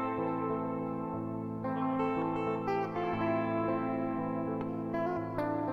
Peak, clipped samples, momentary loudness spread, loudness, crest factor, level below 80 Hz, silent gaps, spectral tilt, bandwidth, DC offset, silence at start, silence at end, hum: -20 dBFS; under 0.1%; 5 LU; -34 LUFS; 14 dB; -64 dBFS; none; -9 dB/octave; 6.4 kHz; under 0.1%; 0 s; 0 s; none